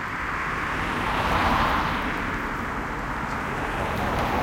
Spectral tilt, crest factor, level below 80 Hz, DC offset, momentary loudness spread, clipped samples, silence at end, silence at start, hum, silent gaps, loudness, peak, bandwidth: -5 dB/octave; 16 dB; -36 dBFS; under 0.1%; 7 LU; under 0.1%; 0 s; 0 s; none; none; -26 LUFS; -10 dBFS; 17 kHz